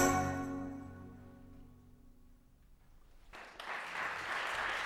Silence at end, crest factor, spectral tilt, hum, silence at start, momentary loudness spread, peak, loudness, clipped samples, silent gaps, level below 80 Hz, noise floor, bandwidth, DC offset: 0 s; 24 dB; -4 dB/octave; none; 0 s; 22 LU; -16 dBFS; -39 LUFS; under 0.1%; none; -58 dBFS; -62 dBFS; 16.5 kHz; under 0.1%